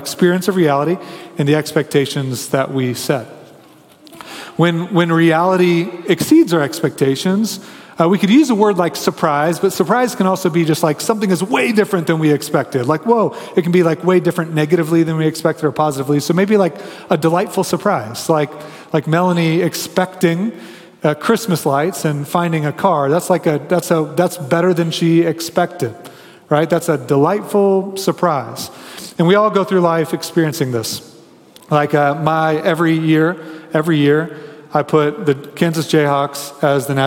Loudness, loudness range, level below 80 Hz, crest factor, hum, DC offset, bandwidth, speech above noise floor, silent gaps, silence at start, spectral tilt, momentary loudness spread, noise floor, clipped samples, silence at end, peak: -16 LUFS; 3 LU; -62 dBFS; 16 dB; none; under 0.1%; 17.5 kHz; 29 dB; none; 0 s; -6 dB/octave; 8 LU; -44 dBFS; under 0.1%; 0 s; 0 dBFS